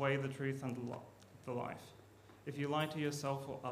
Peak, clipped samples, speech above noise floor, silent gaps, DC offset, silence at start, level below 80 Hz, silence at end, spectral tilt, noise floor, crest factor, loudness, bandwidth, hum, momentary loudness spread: -22 dBFS; under 0.1%; 21 dB; none; under 0.1%; 0 s; -78 dBFS; 0 s; -6 dB/octave; -61 dBFS; 20 dB; -41 LUFS; 15.5 kHz; none; 19 LU